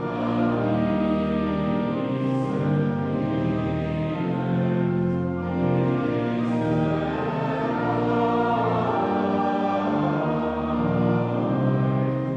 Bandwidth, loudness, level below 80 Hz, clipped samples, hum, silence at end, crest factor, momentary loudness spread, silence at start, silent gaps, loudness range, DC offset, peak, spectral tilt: 7.6 kHz; -24 LUFS; -48 dBFS; under 0.1%; none; 0 s; 14 dB; 3 LU; 0 s; none; 1 LU; under 0.1%; -10 dBFS; -9.5 dB/octave